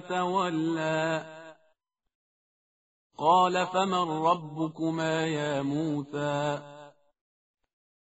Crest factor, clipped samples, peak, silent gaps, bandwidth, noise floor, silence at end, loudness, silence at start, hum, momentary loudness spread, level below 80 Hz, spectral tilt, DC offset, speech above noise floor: 18 dB; under 0.1%; -12 dBFS; 2.15-3.10 s; 8 kHz; -73 dBFS; 1.3 s; -28 LUFS; 0 s; none; 11 LU; -70 dBFS; -4 dB/octave; under 0.1%; 46 dB